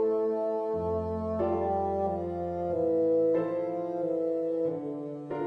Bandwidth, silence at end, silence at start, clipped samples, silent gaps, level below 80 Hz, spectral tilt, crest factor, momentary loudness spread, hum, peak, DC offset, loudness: 5.4 kHz; 0 s; 0 s; under 0.1%; none; -56 dBFS; -10 dB/octave; 12 dB; 7 LU; none; -18 dBFS; under 0.1%; -30 LUFS